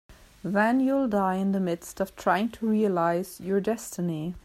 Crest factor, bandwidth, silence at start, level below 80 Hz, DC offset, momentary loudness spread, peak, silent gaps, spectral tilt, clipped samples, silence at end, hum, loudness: 16 dB; 15.5 kHz; 0.1 s; -58 dBFS; under 0.1%; 7 LU; -10 dBFS; none; -6.5 dB/octave; under 0.1%; 0.05 s; none; -26 LUFS